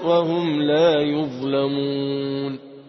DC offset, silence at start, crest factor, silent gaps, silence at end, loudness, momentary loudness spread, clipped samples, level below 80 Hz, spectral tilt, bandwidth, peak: under 0.1%; 0 s; 14 dB; none; 0.05 s; -21 LUFS; 8 LU; under 0.1%; -64 dBFS; -7.5 dB/octave; 6.2 kHz; -6 dBFS